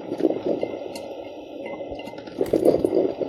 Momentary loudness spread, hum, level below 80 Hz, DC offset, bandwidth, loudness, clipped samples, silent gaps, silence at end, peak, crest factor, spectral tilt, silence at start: 16 LU; none; -54 dBFS; under 0.1%; 16 kHz; -25 LUFS; under 0.1%; none; 0 s; -4 dBFS; 20 dB; -7 dB/octave; 0 s